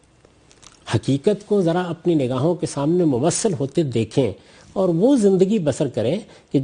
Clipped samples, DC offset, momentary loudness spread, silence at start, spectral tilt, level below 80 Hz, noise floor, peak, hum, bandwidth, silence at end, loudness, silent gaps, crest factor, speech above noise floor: under 0.1%; under 0.1%; 8 LU; 0.85 s; -6.5 dB/octave; -56 dBFS; -53 dBFS; -4 dBFS; none; 11 kHz; 0 s; -20 LUFS; none; 16 dB; 34 dB